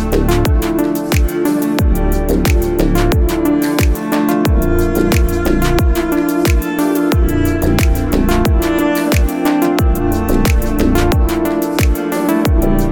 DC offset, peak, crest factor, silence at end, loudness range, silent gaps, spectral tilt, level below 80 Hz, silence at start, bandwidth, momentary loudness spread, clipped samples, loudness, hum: 0.2%; 0 dBFS; 12 dB; 0 s; 1 LU; none; -6 dB/octave; -18 dBFS; 0 s; 19.5 kHz; 2 LU; under 0.1%; -14 LUFS; none